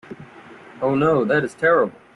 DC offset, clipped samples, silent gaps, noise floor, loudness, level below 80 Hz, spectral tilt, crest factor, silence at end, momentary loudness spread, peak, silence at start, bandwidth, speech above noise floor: under 0.1%; under 0.1%; none; -43 dBFS; -19 LUFS; -60 dBFS; -7 dB/octave; 16 dB; 0.25 s; 16 LU; -6 dBFS; 0.1 s; 11.5 kHz; 25 dB